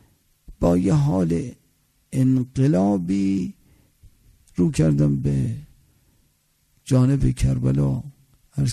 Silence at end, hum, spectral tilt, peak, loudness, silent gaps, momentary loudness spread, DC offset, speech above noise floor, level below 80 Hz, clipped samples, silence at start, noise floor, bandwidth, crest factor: 0 s; none; -8 dB/octave; -6 dBFS; -21 LUFS; none; 14 LU; under 0.1%; 45 dB; -38 dBFS; under 0.1%; 0.5 s; -65 dBFS; 12.5 kHz; 16 dB